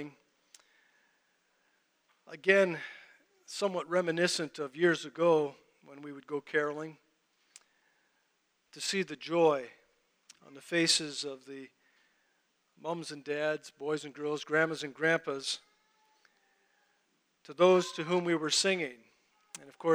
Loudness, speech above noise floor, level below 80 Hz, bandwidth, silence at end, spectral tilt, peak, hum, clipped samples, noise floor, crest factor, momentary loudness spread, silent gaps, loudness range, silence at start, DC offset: -31 LUFS; 45 dB; -88 dBFS; over 20 kHz; 0 s; -3.5 dB/octave; -10 dBFS; none; under 0.1%; -76 dBFS; 24 dB; 21 LU; none; 6 LU; 0 s; under 0.1%